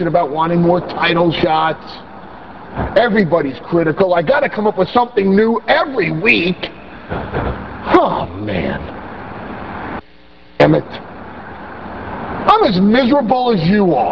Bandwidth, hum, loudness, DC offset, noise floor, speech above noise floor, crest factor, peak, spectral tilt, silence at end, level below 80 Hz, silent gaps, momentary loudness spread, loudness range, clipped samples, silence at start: 6.4 kHz; none; -14 LUFS; 0.8%; -45 dBFS; 31 dB; 16 dB; 0 dBFS; -8.5 dB/octave; 0 s; -38 dBFS; none; 18 LU; 6 LU; under 0.1%; 0 s